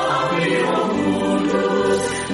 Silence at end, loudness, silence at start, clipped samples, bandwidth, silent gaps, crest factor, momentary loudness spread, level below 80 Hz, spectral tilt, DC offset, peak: 0 s; -19 LUFS; 0 s; under 0.1%; 11.5 kHz; none; 12 dB; 1 LU; -50 dBFS; -5 dB/octave; under 0.1%; -6 dBFS